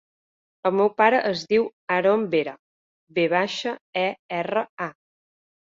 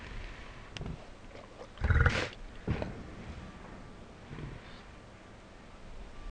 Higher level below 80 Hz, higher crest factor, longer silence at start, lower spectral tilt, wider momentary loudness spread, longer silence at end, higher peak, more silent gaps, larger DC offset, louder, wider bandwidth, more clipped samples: second, -70 dBFS vs -42 dBFS; second, 20 dB vs 26 dB; first, 0.65 s vs 0 s; about the same, -5.5 dB/octave vs -6 dB/octave; second, 11 LU vs 23 LU; first, 0.75 s vs 0 s; first, -4 dBFS vs -12 dBFS; first, 1.73-1.87 s, 2.59-3.07 s, 3.81-3.93 s, 4.19-4.29 s, 4.69-4.77 s vs none; neither; first, -23 LUFS vs -36 LUFS; second, 7.6 kHz vs 9.6 kHz; neither